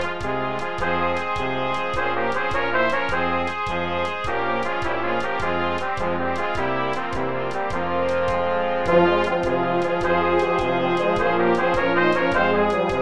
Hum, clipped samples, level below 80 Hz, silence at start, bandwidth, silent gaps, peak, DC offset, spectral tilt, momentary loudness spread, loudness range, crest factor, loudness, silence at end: none; under 0.1%; -44 dBFS; 0 s; 11 kHz; none; -6 dBFS; 3%; -6 dB/octave; 6 LU; 4 LU; 16 dB; -22 LUFS; 0 s